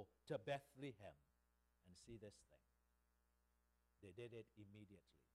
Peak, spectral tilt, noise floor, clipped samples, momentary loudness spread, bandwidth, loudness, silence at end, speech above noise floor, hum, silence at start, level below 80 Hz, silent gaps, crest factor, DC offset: -36 dBFS; -6 dB/octave; -84 dBFS; under 0.1%; 17 LU; 12.5 kHz; -56 LUFS; 0.25 s; 28 dB; 60 Hz at -85 dBFS; 0 s; -82 dBFS; none; 22 dB; under 0.1%